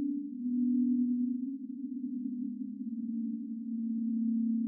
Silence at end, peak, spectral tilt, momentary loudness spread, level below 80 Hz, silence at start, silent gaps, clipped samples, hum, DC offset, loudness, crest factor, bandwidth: 0 s; -22 dBFS; -9.5 dB/octave; 9 LU; under -90 dBFS; 0 s; none; under 0.1%; none; under 0.1%; -34 LUFS; 10 dB; 0.4 kHz